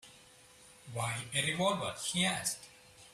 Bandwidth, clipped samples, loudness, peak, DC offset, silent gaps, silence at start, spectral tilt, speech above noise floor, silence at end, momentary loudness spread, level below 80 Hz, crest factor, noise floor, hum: 15.5 kHz; under 0.1%; -34 LUFS; -18 dBFS; under 0.1%; none; 0.05 s; -3 dB/octave; 25 dB; 0 s; 14 LU; -68 dBFS; 20 dB; -59 dBFS; none